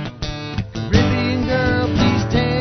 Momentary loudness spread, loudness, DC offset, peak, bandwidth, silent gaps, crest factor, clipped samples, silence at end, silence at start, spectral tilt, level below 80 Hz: 10 LU; -19 LUFS; under 0.1%; -2 dBFS; 6.4 kHz; none; 16 dB; under 0.1%; 0 s; 0 s; -6.5 dB/octave; -30 dBFS